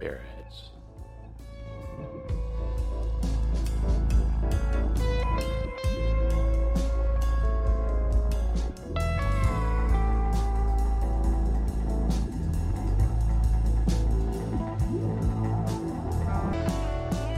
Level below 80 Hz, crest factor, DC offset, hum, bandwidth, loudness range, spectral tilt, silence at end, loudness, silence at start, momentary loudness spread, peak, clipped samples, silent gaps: -26 dBFS; 10 dB; under 0.1%; none; 10.5 kHz; 3 LU; -7.5 dB/octave; 0 s; -28 LUFS; 0 s; 13 LU; -14 dBFS; under 0.1%; none